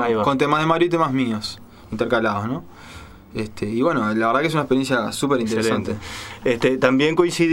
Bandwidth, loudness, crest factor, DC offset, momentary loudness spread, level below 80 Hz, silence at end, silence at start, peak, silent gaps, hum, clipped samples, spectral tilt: 16 kHz; -20 LUFS; 20 dB; under 0.1%; 15 LU; -50 dBFS; 0 s; 0 s; 0 dBFS; none; none; under 0.1%; -5.5 dB/octave